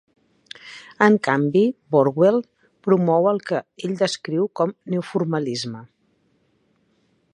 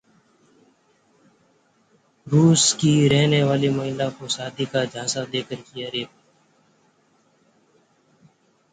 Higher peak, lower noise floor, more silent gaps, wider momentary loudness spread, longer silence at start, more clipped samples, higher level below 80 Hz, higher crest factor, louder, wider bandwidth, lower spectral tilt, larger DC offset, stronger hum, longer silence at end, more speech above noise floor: first, 0 dBFS vs -4 dBFS; about the same, -65 dBFS vs -62 dBFS; neither; first, 18 LU vs 13 LU; second, 0.65 s vs 2.25 s; neither; second, -70 dBFS vs -60 dBFS; about the same, 20 dB vs 20 dB; about the same, -21 LUFS vs -21 LUFS; first, 11 kHz vs 9.6 kHz; first, -6.5 dB/octave vs -4.5 dB/octave; neither; neither; second, 1.5 s vs 2.65 s; about the same, 45 dB vs 42 dB